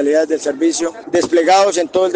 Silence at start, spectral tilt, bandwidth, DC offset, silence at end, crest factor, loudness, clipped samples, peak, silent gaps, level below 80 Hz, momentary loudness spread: 0 s; -3 dB/octave; 10 kHz; under 0.1%; 0 s; 12 dB; -15 LUFS; under 0.1%; -2 dBFS; none; -60 dBFS; 7 LU